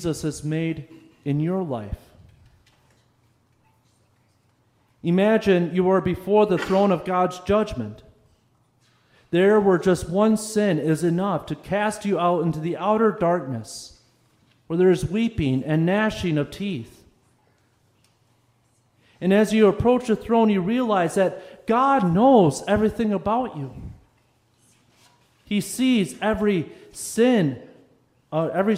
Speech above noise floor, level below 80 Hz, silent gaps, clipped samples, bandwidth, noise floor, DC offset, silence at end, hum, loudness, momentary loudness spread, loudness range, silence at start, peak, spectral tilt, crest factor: 43 dB; -50 dBFS; none; under 0.1%; 16 kHz; -64 dBFS; under 0.1%; 0 s; none; -21 LUFS; 13 LU; 9 LU; 0 s; -4 dBFS; -6.5 dB/octave; 18 dB